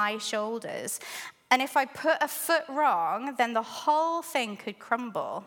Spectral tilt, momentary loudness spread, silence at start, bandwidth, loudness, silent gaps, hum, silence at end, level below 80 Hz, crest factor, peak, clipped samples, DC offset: -2 dB/octave; 9 LU; 0 s; 17.5 kHz; -28 LUFS; none; none; 0 s; -84 dBFS; 22 dB; -6 dBFS; under 0.1%; under 0.1%